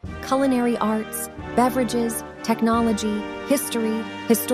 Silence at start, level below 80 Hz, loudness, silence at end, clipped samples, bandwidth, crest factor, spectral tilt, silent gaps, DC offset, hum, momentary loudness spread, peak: 0.05 s; -48 dBFS; -23 LUFS; 0 s; under 0.1%; 16 kHz; 16 dB; -4.5 dB/octave; none; under 0.1%; none; 8 LU; -6 dBFS